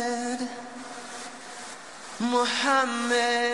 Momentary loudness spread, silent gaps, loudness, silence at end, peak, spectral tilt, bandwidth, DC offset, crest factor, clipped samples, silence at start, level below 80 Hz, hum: 16 LU; none; -25 LUFS; 0 s; -10 dBFS; -2 dB/octave; 12.5 kHz; 0.2%; 18 dB; under 0.1%; 0 s; -74 dBFS; none